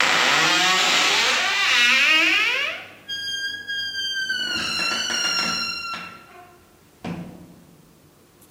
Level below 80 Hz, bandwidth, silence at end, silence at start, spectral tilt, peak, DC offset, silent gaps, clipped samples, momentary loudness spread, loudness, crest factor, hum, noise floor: -62 dBFS; 16 kHz; 1 s; 0 s; -0.5 dB/octave; 0 dBFS; under 0.1%; none; under 0.1%; 19 LU; -19 LUFS; 22 dB; none; -53 dBFS